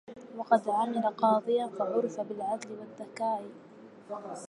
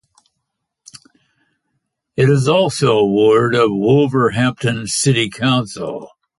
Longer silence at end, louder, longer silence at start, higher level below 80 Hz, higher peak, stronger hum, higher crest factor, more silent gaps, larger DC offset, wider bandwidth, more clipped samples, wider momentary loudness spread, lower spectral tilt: second, 0.05 s vs 0.35 s; second, -30 LUFS vs -15 LUFS; second, 0.1 s vs 2.15 s; second, -84 dBFS vs -52 dBFS; second, -10 dBFS vs -2 dBFS; neither; first, 22 dB vs 16 dB; neither; neither; about the same, 11 kHz vs 11.5 kHz; neither; first, 17 LU vs 12 LU; about the same, -5.5 dB/octave vs -5.5 dB/octave